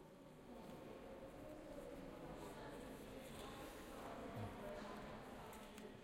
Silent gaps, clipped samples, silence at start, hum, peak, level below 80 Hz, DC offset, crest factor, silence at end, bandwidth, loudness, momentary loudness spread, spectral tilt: none; under 0.1%; 0 s; none; -38 dBFS; -66 dBFS; under 0.1%; 16 dB; 0 s; 16 kHz; -55 LUFS; 5 LU; -5.5 dB/octave